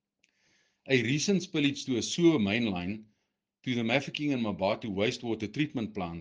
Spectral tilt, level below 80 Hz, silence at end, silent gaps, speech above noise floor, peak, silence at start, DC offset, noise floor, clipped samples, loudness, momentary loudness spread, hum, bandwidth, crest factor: -5 dB/octave; -68 dBFS; 0 s; none; 52 dB; -10 dBFS; 0.85 s; under 0.1%; -81 dBFS; under 0.1%; -30 LUFS; 10 LU; none; 10 kHz; 20 dB